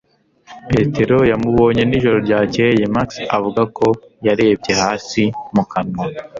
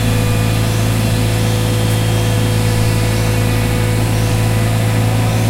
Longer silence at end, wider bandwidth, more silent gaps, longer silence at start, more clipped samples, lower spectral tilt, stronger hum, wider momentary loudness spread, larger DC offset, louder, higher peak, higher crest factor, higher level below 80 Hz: about the same, 0 s vs 0 s; second, 7.6 kHz vs 16 kHz; neither; first, 0.5 s vs 0 s; neither; about the same, -6 dB/octave vs -5.5 dB/octave; neither; first, 6 LU vs 1 LU; neither; about the same, -16 LUFS vs -15 LUFS; about the same, -2 dBFS vs -2 dBFS; about the same, 14 dB vs 12 dB; second, -42 dBFS vs -24 dBFS